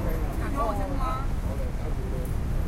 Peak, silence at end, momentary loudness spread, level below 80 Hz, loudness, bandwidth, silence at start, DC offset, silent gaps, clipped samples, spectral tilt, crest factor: -14 dBFS; 0 s; 4 LU; -28 dBFS; -30 LUFS; 16 kHz; 0 s; under 0.1%; none; under 0.1%; -7 dB/octave; 12 dB